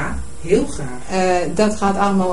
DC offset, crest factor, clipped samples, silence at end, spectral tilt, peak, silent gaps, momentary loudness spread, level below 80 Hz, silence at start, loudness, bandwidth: 6%; 16 dB; under 0.1%; 0 s; -5.5 dB/octave; -4 dBFS; none; 10 LU; -34 dBFS; 0 s; -19 LUFS; 11.5 kHz